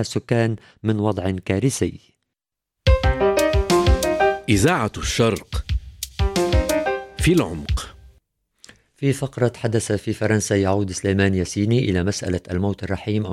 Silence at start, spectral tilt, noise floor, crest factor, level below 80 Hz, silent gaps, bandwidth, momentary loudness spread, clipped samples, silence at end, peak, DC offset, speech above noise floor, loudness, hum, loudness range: 0 s; -5.5 dB/octave; -84 dBFS; 16 dB; -30 dBFS; none; 16.5 kHz; 9 LU; under 0.1%; 0 s; -4 dBFS; under 0.1%; 63 dB; -21 LUFS; none; 4 LU